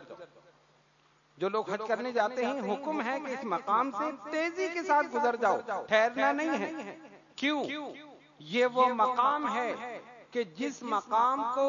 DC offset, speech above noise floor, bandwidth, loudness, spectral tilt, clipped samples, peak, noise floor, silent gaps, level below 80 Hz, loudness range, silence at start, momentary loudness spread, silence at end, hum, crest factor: under 0.1%; 36 dB; 7.2 kHz; -30 LUFS; -2 dB/octave; under 0.1%; -12 dBFS; -66 dBFS; none; -82 dBFS; 3 LU; 0 s; 13 LU; 0 s; none; 20 dB